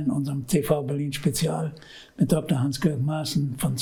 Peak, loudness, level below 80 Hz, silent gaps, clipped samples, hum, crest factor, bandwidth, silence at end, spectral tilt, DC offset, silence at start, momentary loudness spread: -6 dBFS; -25 LUFS; -50 dBFS; none; under 0.1%; none; 18 dB; 19.5 kHz; 0 s; -6 dB/octave; under 0.1%; 0 s; 6 LU